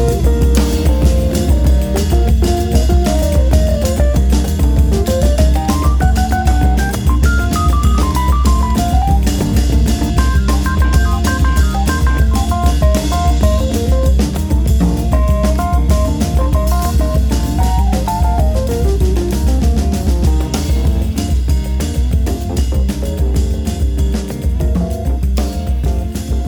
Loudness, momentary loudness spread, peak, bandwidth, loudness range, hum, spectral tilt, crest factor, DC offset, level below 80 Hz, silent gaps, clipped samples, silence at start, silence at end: -14 LUFS; 4 LU; 0 dBFS; 18.5 kHz; 3 LU; none; -6.5 dB/octave; 12 dB; under 0.1%; -14 dBFS; none; under 0.1%; 0 s; 0 s